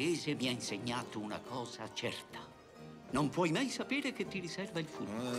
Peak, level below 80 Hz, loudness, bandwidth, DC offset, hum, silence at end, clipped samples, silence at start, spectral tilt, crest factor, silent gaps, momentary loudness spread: -20 dBFS; -70 dBFS; -38 LUFS; 15.5 kHz; under 0.1%; none; 0 s; under 0.1%; 0 s; -4.5 dB/octave; 18 dB; none; 16 LU